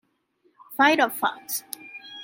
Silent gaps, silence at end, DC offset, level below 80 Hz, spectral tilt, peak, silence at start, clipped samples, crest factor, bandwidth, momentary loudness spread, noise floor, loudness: none; 0 s; under 0.1%; -78 dBFS; -1.5 dB/octave; -4 dBFS; 0.7 s; under 0.1%; 22 dB; 17 kHz; 19 LU; -67 dBFS; -23 LUFS